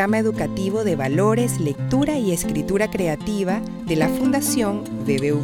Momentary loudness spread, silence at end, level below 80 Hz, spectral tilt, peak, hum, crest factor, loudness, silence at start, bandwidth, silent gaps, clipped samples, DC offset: 5 LU; 0 s; -44 dBFS; -5.5 dB/octave; -6 dBFS; none; 16 dB; -21 LUFS; 0 s; 19 kHz; none; under 0.1%; under 0.1%